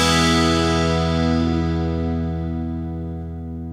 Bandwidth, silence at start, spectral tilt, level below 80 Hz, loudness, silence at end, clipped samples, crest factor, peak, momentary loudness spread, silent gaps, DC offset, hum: 14.5 kHz; 0 s; -5 dB/octave; -32 dBFS; -20 LUFS; 0 s; under 0.1%; 16 dB; -4 dBFS; 13 LU; none; under 0.1%; none